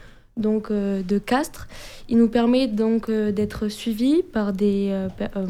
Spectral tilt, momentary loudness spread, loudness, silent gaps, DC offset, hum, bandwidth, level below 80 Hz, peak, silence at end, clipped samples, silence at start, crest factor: -6.5 dB/octave; 9 LU; -22 LUFS; none; under 0.1%; none; 15.5 kHz; -46 dBFS; -8 dBFS; 0 s; under 0.1%; 0 s; 14 dB